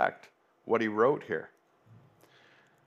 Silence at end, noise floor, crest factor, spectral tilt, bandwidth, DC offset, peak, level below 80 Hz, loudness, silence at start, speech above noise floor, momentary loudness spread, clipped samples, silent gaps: 1.4 s; -62 dBFS; 22 dB; -7 dB/octave; 7 kHz; under 0.1%; -10 dBFS; -84 dBFS; -30 LUFS; 0 s; 33 dB; 21 LU; under 0.1%; none